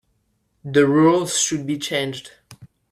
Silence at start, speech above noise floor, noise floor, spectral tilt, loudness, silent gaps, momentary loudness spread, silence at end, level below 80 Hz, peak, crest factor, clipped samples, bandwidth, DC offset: 0.65 s; 49 dB; -68 dBFS; -4 dB/octave; -19 LUFS; none; 15 LU; 0.25 s; -60 dBFS; -2 dBFS; 18 dB; under 0.1%; 14.5 kHz; under 0.1%